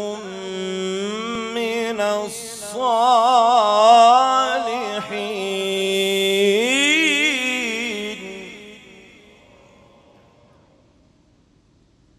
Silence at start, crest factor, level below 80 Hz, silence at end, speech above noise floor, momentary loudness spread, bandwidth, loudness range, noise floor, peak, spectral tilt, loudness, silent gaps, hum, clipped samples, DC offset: 0 s; 20 dB; -62 dBFS; 3.4 s; 40 dB; 16 LU; 15 kHz; 9 LU; -57 dBFS; 0 dBFS; -2.5 dB/octave; -18 LUFS; none; none; under 0.1%; under 0.1%